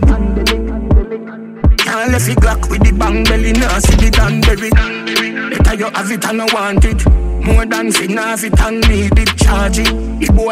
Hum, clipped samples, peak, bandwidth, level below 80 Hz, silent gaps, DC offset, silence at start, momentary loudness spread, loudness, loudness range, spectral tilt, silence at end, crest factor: none; under 0.1%; 0 dBFS; 16 kHz; -14 dBFS; none; under 0.1%; 0 s; 5 LU; -13 LUFS; 2 LU; -5 dB/octave; 0 s; 12 dB